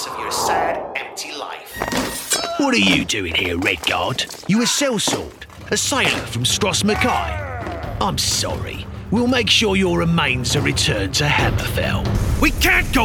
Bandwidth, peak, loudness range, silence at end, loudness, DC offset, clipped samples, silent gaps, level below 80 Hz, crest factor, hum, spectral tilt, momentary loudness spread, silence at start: over 20 kHz; -2 dBFS; 2 LU; 0 s; -18 LUFS; under 0.1%; under 0.1%; none; -32 dBFS; 16 dB; none; -3.5 dB/octave; 12 LU; 0 s